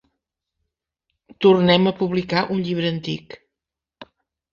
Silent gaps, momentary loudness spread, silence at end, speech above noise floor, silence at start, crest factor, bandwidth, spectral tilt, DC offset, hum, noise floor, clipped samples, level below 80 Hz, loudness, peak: none; 13 LU; 0.5 s; 67 dB; 1.4 s; 20 dB; 7 kHz; -7.5 dB/octave; under 0.1%; none; -86 dBFS; under 0.1%; -58 dBFS; -19 LUFS; -2 dBFS